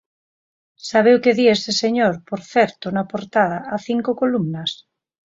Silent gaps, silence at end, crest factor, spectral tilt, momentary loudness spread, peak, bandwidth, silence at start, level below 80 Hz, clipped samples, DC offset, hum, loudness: none; 0.65 s; 18 dB; -5 dB/octave; 12 LU; -2 dBFS; 7.8 kHz; 0.85 s; -64 dBFS; under 0.1%; under 0.1%; none; -19 LUFS